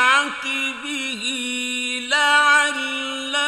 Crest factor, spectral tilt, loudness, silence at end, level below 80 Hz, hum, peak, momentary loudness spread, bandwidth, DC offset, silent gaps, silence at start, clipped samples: 16 dB; 0.5 dB/octave; -19 LUFS; 0 s; -66 dBFS; none; -4 dBFS; 10 LU; 15 kHz; under 0.1%; none; 0 s; under 0.1%